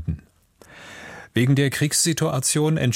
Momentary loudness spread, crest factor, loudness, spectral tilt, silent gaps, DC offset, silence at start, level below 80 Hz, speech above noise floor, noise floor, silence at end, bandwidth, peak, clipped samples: 20 LU; 16 dB; -20 LUFS; -4.5 dB/octave; none; under 0.1%; 0 s; -46 dBFS; 33 dB; -53 dBFS; 0 s; 16.5 kHz; -6 dBFS; under 0.1%